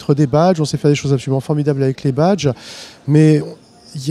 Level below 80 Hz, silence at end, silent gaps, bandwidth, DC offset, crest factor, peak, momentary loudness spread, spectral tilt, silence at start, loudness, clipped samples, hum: -50 dBFS; 0 s; none; 11.5 kHz; under 0.1%; 14 dB; 0 dBFS; 16 LU; -7 dB/octave; 0 s; -15 LUFS; under 0.1%; none